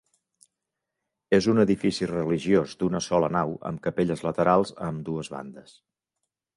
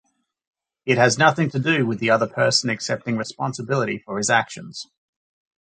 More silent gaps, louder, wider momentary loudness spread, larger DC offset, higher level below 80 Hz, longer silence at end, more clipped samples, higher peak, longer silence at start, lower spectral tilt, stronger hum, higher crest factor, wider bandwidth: neither; second, -25 LUFS vs -20 LUFS; second, 11 LU vs 15 LU; neither; first, -56 dBFS vs -64 dBFS; first, 0.95 s vs 0.75 s; neither; second, -6 dBFS vs -2 dBFS; first, 1.3 s vs 0.85 s; first, -6.5 dB/octave vs -4 dB/octave; neither; about the same, 20 dB vs 20 dB; first, 11.5 kHz vs 9.4 kHz